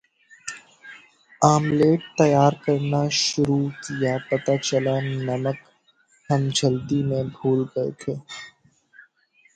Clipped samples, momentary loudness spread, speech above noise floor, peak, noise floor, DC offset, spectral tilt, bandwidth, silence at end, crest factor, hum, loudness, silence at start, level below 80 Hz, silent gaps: under 0.1%; 18 LU; 40 dB; -2 dBFS; -61 dBFS; under 0.1%; -5.5 dB/octave; 9.4 kHz; 1.05 s; 20 dB; none; -22 LUFS; 0.45 s; -58 dBFS; none